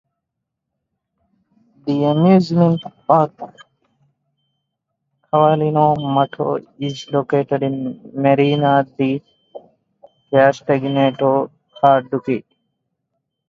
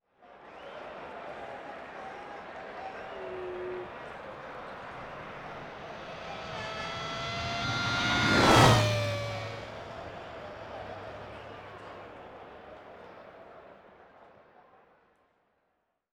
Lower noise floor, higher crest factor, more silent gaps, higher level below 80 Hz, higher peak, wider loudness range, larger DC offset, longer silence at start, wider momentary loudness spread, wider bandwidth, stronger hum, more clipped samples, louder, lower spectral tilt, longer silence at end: about the same, -79 dBFS vs -78 dBFS; second, 18 dB vs 24 dB; neither; second, -62 dBFS vs -52 dBFS; first, 0 dBFS vs -10 dBFS; second, 2 LU vs 21 LU; neither; first, 1.85 s vs 0.2 s; second, 11 LU vs 23 LU; second, 7.4 kHz vs 19.5 kHz; neither; neither; first, -17 LUFS vs -31 LUFS; first, -8 dB/octave vs -4.5 dB/octave; second, 1.1 s vs 1.7 s